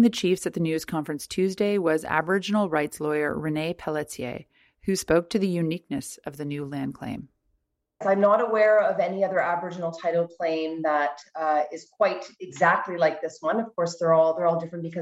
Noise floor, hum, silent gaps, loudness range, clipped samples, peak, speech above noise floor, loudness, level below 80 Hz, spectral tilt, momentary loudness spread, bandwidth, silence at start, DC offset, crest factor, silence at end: -75 dBFS; none; none; 5 LU; under 0.1%; -6 dBFS; 50 dB; -25 LUFS; -60 dBFS; -5.5 dB/octave; 13 LU; 15.5 kHz; 0 s; under 0.1%; 18 dB; 0 s